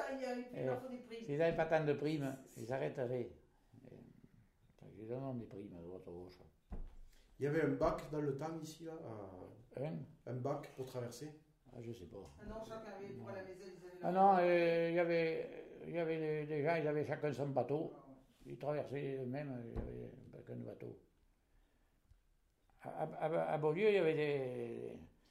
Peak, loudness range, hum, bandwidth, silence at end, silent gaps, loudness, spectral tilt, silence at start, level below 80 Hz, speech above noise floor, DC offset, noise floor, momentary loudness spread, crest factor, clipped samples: -20 dBFS; 15 LU; none; 15 kHz; 0.25 s; none; -39 LUFS; -7 dB/octave; 0 s; -62 dBFS; 35 dB; under 0.1%; -75 dBFS; 20 LU; 20 dB; under 0.1%